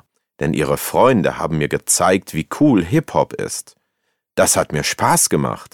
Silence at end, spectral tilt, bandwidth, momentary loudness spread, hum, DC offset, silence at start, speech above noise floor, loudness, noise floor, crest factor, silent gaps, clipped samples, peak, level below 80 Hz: 0.1 s; -4 dB/octave; 18.5 kHz; 11 LU; none; under 0.1%; 0.4 s; 55 dB; -17 LUFS; -72 dBFS; 16 dB; none; under 0.1%; -2 dBFS; -44 dBFS